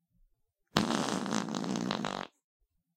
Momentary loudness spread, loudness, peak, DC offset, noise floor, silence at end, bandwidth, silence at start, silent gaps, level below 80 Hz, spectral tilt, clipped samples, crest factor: 8 LU; -34 LUFS; -4 dBFS; under 0.1%; -74 dBFS; 0.7 s; 16.5 kHz; 0.75 s; none; -64 dBFS; -4 dB/octave; under 0.1%; 32 dB